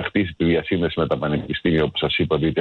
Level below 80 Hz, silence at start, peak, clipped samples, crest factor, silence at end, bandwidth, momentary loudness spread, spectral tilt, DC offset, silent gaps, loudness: -42 dBFS; 0 s; -8 dBFS; under 0.1%; 12 dB; 0 s; 4.5 kHz; 3 LU; -8.5 dB/octave; under 0.1%; none; -21 LUFS